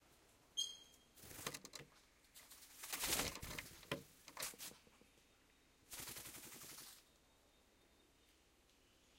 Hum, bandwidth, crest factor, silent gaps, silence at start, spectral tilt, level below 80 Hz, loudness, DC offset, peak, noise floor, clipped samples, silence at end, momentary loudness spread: none; 16 kHz; 28 dB; none; 0 s; -1 dB/octave; -70 dBFS; -47 LUFS; under 0.1%; -26 dBFS; -73 dBFS; under 0.1%; 0 s; 21 LU